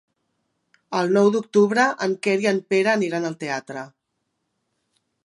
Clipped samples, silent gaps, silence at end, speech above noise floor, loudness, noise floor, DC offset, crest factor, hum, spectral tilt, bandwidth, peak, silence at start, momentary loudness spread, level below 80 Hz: under 0.1%; none; 1.35 s; 56 dB; -21 LUFS; -76 dBFS; under 0.1%; 18 dB; none; -5.5 dB/octave; 11.5 kHz; -4 dBFS; 0.9 s; 11 LU; -76 dBFS